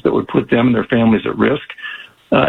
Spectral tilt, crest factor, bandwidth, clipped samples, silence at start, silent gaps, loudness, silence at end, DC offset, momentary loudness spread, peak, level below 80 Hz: -8.5 dB/octave; 14 dB; 4.2 kHz; under 0.1%; 0.05 s; none; -15 LUFS; 0 s; under 0.1%; 14 LU; 0 dBFS; -46 dBFS